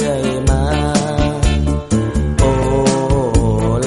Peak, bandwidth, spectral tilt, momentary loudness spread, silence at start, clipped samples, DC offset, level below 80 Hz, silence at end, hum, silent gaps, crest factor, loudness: -2 dBFS; 11.5 kHz; -6 dB/octave; 3 LU; 0 s; under 0.1%; under 0.1%; -20 dBFS; 0 s; none; none; 12 dB; -16 LUFS